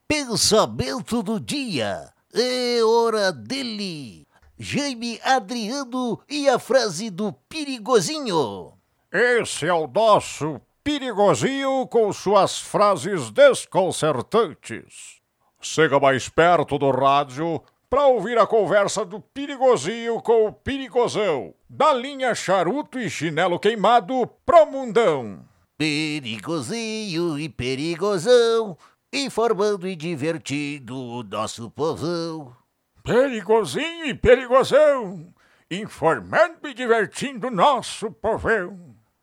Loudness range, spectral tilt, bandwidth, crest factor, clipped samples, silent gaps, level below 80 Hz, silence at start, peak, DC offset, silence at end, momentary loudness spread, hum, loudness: 5 LU; -4 dB/octave; 16 kHz; 18 dB; under 0.1%; none; -52 dBFS; 0.1 s; -2 dBFS; under 0.1%; 0.3 s; 13 LU; none; -21 LUFS